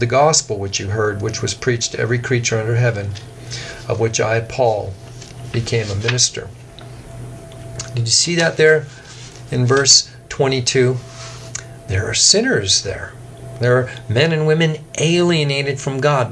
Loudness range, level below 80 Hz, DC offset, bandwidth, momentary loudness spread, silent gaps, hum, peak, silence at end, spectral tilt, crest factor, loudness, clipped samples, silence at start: 6 LU; -46 dBFS; under 0.1%; 11 kHz; 21 LU; none; none; 0 dBFS; 0 s; -3.5 dB/octave; 18 dB; -16 LUFS; under 0.1%; 0 s